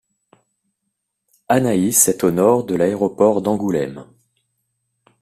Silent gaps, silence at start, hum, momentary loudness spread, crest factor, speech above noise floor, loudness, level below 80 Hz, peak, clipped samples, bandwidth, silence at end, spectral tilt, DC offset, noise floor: none; 1.5 s; none; 8 LU; 20 dB; 59 dB; -17 LUFS; -56 dBFS; 0 dBFS; under 0.1%; 15.5 kHz; 1.2 s; -5 dB/octave; under 0.1%; -76 dBFS